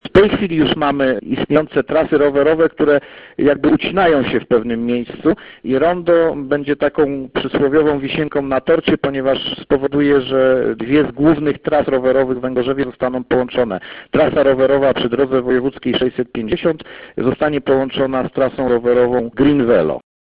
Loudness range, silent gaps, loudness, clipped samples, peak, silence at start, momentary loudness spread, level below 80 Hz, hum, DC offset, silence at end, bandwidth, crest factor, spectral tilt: 2 LU; none; -16 LUFS; under 0.1%; 0 dBFS; 0.05 s; 6 LU; -42 dBFS; none; under 0.1%; 0.25 s; 5.2 kHz; 16 dB; -9 dB/octave